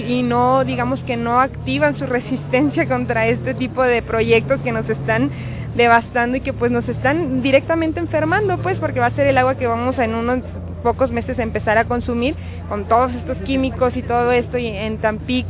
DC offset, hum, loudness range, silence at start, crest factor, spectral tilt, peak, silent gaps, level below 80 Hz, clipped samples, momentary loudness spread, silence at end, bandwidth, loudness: under 0.1%; none; 2 LU; 0 s; 18 dB; -10.5 dB/octave; 0 dBFS; none; -34 dBFS; under 0.1%; 7 LU; 0 s; 4 kHz; -18 LUFS